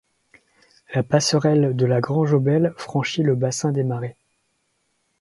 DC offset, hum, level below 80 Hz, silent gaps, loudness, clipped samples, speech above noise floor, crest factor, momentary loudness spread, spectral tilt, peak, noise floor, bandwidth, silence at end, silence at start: under 0.1%; none; -62 dBFS; none; -21 LUFS; under 0.1%; 50 dB; 18 dB; 8 LU; -6 dB/octave; -2 dBFS; -70 dBFS; 11.5 kHz; 1.1 s; 0.9 s